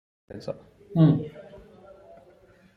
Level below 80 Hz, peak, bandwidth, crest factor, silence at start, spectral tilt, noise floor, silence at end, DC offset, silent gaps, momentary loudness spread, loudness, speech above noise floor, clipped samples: -60 dBFS; -8 dBFS; 5.4 kHz; 20 dB; 0.3 s; -10.5 dB/octave; -56 dBFS; 1.35 s; under 0.1%; none; 25 LU; -24 LUFS; 32 dB; under 0.1%